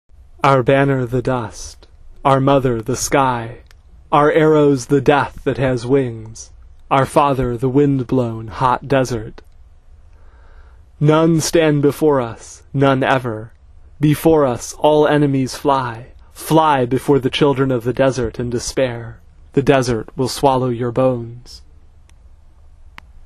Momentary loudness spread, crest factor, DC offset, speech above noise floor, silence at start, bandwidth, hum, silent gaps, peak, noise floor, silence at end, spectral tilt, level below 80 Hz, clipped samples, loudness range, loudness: 13 LU; 16 dB; under 0.1%; 28 dB; 0.45 s; 14 kHz; none; none; 0 dBFS; -44 dBFS; 0 s; -6 dB/octave; -40 dBFS; under 0.1%; 3 LU; -16 LUFS